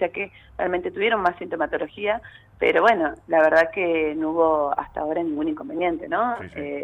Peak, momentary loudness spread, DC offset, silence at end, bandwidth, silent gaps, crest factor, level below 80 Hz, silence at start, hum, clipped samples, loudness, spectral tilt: -6 dBFS; 10 LU; under 0.1%; 0 s; 8.6 kHz; none; 16 dB; -54 dBFS; 0 s; none; under 0.1%; -23 LUFS; -6 dB/octave